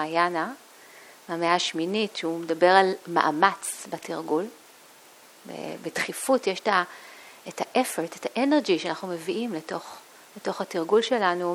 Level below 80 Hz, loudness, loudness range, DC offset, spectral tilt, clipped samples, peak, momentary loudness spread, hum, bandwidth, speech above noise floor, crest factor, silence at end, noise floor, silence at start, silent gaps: -76 dBFS; -26 LUFS; 5 LU; under 0.1%; -3.5 dB/octave; under 0.1%; -2 dBFS; 16 LU; none; 18.5 kHz; 26 dB; 24 dB; 0 s; -52 dBFS; 0 s; none